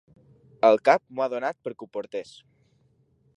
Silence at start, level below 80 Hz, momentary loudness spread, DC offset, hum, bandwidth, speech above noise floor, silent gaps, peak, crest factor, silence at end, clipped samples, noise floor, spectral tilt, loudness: 0.65 s; -76 dBFS; 17 LU; under 0.1%; none; 11 kHz; 41 dB; none; -4 dBFS; 24 dB; 1.15 s; under 0.1%; -65 dBFS; -5 dB/octave; -24 LUFS